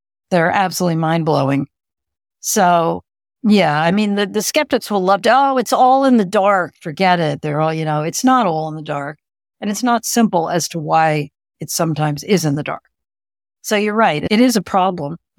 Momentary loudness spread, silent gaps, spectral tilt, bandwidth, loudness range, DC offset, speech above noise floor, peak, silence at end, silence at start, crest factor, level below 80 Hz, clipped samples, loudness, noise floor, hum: 11 LU; none; -5 dB/octave; 18.5 kHz; 4 LU; under 0.1%; over 75 dB; -2 dBFS; 0.2 s; 0.3 s; 14 dB; -58 dBFS; under 0.1%; -16 LUFS; under -90 dBFS; none